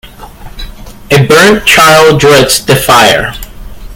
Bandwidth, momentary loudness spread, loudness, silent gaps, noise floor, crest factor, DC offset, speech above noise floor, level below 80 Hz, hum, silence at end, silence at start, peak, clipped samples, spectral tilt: over 20 kHz; 8 LU; -4 LUFS; none; -27 dBFS; 6 dB; under 0.1%; 22 dB; -28 dBFS; none; 0 s; 0.05 s; 0 dBFS; 6%; -3.5 dB/octave